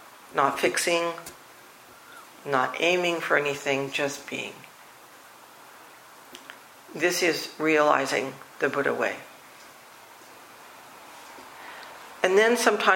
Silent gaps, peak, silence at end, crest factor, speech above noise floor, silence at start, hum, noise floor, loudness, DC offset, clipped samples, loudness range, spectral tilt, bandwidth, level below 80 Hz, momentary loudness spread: none; -4 dBFS; 0 s; 24 dB; 25 dB; 0 s; none; -50 dBFS; -25 LUFS; under 0.1%; under 0.1%; 8 LU; -3 dB/octave; 16.5 kHz; -74 dBFS; 26 LU